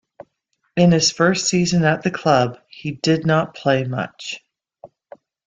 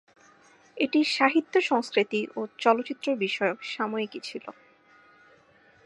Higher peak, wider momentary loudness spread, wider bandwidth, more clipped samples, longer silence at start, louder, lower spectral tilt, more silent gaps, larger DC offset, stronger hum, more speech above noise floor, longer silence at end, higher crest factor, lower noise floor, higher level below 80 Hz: about the same, -2 dBFS vs -4 dBFS; first, 15 LU vs 12 LU; second, 9 kHz vs 11.5 kHz; neither; about the same, 0.75 s vs 0.75 s; first, -18 LUFS vs -26 LUFS; about the same, -4.5 dB/octave vs -4 dB/octave; neither; neither; neither; first, 52 dB vs 33 dB; second, 0.6 s vs 1.35 s; second, 18 dB vs 24 dB; first, -70 dBFS vs -59 dBFS; first, -54 dBFS vs -82 dBFS